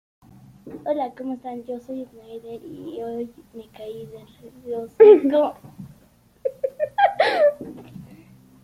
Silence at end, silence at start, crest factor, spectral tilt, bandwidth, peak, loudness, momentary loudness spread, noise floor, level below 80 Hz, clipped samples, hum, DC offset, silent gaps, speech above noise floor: 0.6 s; 0.65 s; 20 dB; -6 dB/octave; 11.5 kHz; -2 dBFS; -20 LUFS; 27 LU; -56 dBFS; -64 dBFS; under 0.1%; none; under 0.1%; none; 34 dB